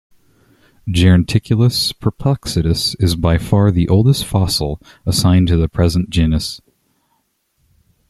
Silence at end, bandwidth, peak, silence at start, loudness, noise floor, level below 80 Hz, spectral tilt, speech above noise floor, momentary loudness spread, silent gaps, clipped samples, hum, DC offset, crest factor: 1.55 s; 13.5 kHz; -2 dBFS; 0.85 s; -15 LUFS; -65 dBFS; -32 dBFS; -6 dB/octave; 51 dB; 8 LU; none; under 0.1%; none; under 0.1%; 14 dB